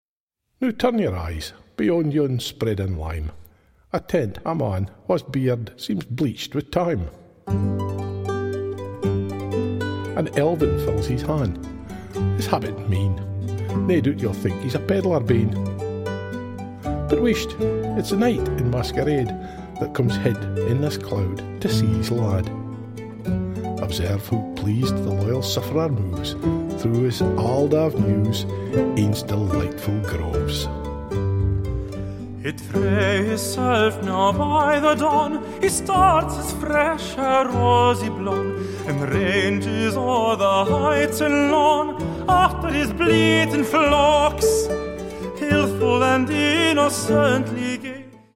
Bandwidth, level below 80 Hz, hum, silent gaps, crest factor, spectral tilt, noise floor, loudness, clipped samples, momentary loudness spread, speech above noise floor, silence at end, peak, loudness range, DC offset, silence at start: 16.5 kHz; -38 dBFS; none; none; 18 dB; -6 dB/octave; -80 dBFS; -22 LUFS; under 0.1%; 11 LU; 60 dB; 0.2 s; -2 dBFS; 6 LU; under 0.1%; 0.6 s